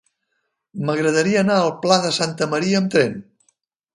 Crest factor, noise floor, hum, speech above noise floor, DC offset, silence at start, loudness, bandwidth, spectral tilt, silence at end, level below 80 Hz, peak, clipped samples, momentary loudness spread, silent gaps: 20 dB; -74 dBFS; none; 55 dB; under 0.1%; 0.75 s; -19 LUFS; 11.5 kHz; -4.5 dB/octave; 0.7 s; -64 dBFS; 0 dBFS; under 0.1%; 8 LU; none